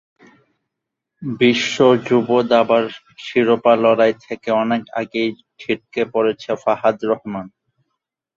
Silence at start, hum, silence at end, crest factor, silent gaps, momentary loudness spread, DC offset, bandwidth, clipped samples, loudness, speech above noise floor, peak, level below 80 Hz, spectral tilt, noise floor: 1.2 s; none; 0.9 s; 16 dB; none; 13 LU; under 0.1%; 7.6 kHz; under 0.1%; -17 LUFS; 64 dB; -2 dBFS; -62 dBFS; -5.5 dB/octave; -81 dBFS